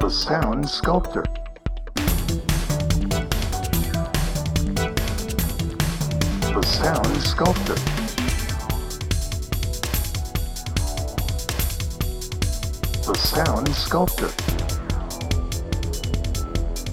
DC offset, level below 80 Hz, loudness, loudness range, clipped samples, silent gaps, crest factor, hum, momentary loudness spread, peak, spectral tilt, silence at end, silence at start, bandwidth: under 0.1%; -28 dBFS; -24 LUFS; 4 LU; under 0.1%; none; 22 dB; none; 7 LU; -2 dBFS; -4.5 dB/octave; 0 s; 0 s; 19.5 kHz